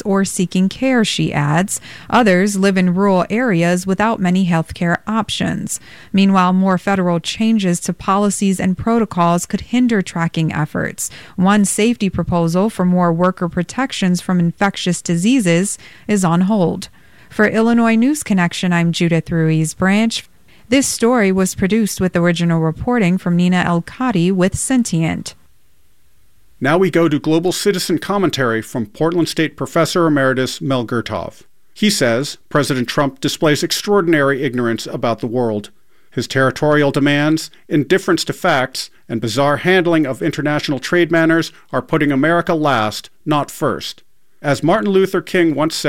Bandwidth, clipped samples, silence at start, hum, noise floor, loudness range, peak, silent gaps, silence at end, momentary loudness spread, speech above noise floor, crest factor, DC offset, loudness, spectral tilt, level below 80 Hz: 16 kHz; under 0.1%; 0.05 s; none; -58 dBFS; 2 LU; -2 dBFS; none; 0 s; 7 LU; 42 dB; 14 dB; 0.5%; -16 LUFS; -5 dB/octave; -46 dBFS